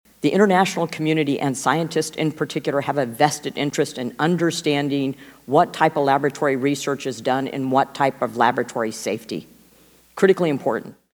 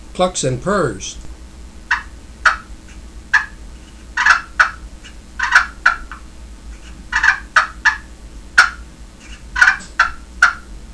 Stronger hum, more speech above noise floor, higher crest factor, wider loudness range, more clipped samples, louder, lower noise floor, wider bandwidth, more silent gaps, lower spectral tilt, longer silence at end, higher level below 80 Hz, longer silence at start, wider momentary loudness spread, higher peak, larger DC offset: neither; first, 33 dB vs 18 dB; about the same, 22 dB vs 18 dB; about the same, 2 LU vs 4 LU; neither; second, -21 LUFS vs -16 LUFS; first, -53 dBFS vs -37 dBFS; first, over 20 kHz vs 11 kHz; neither; first, -5 dB/octave vs -2.5 dB/octave; first, 0.2 s vs 0 s; second, -66 dBFS vs -36 dBFS; first, 0.25 s vs 0 s; second, 8 LU vs 23 LU; about the same, 0 dBFS vs 0 dBFS; second, under 0.1% vs 0.3%